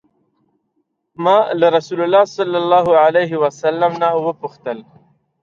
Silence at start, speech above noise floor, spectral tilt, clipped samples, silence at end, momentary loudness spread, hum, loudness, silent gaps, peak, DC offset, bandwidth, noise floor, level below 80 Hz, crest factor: 1.2 s; 54 dB; -6 dB/octave; under 0.1%; 0.6 s; 14 LU; none; -15 LUFS; none; -2 dBFS; under 0.1%; 7.4 kHz; -69 dBFS; -64 dBFS; 14 dB